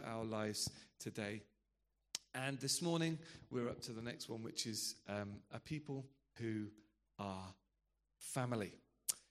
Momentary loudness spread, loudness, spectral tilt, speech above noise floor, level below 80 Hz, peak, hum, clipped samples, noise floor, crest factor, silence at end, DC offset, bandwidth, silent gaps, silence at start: 13 LU; -44 LUFS; -4 dB/octave; 41 dB; -76 dBFS; -18 dBFS; none; under 0.1%; -85 dBFS; 28 dB; 0.1 s; under 0.1%; 14.5 kHz; none; 0 s